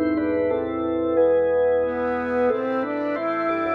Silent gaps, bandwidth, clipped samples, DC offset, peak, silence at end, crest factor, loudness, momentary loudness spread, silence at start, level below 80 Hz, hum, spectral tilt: none; 4.7 kHz; under 0.1%; under 0.1%; -10 dBFS; 0 s; 12 dB; -22 LUFS; 6 LU; 0 s; -52 dBFS; none; -8.5 dB/octave